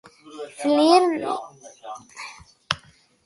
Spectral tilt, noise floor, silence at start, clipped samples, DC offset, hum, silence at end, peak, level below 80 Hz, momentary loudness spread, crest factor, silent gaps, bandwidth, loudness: -4 dB/octave; -53 dBFS; 0.3 s; under 0.1%; under 0.1%; none; 0.5 s; 0 dBFS; -62 dBFS; 24 LU; 24 dB; none; 11.5 kHz; -21 LUFS